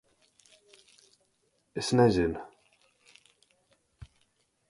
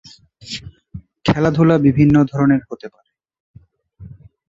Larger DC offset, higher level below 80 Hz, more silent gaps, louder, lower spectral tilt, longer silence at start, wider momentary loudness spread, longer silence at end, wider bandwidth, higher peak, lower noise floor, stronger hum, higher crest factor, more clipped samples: neither; second, -56 dBFS vs -44 dBFS; second, none vs 3.40-3.54 s; second, -27 LUFS vs -15 LUFS; second, -6 dB/octave vs -8 dB/octave; first, 1.75 s vs 0.45 s; second, 18 LU vs 21 LU; first, 2.25 s vs 0.4 s; first, 11.5 kHz vs 7.8 kHz; second, -10 dBFS vs -2 dBFS; first, -73 dBFS vs -45 dBFS; neither; first, 24 dB vs 16 dB; neither